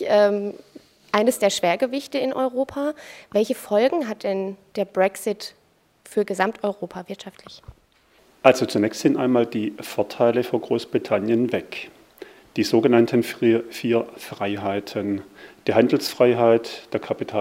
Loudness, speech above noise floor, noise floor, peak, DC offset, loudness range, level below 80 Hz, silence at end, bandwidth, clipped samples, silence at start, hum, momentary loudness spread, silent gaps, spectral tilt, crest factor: -22 LUFS; 37 dB; -58 dBFS; 0 dBFS; under 0.1%; 4 LU; -64 dBFS; 0 s; 16 kHz; under 0.1%; 0 s; none; 14 LU; none; -5 dB/octave; 22 dB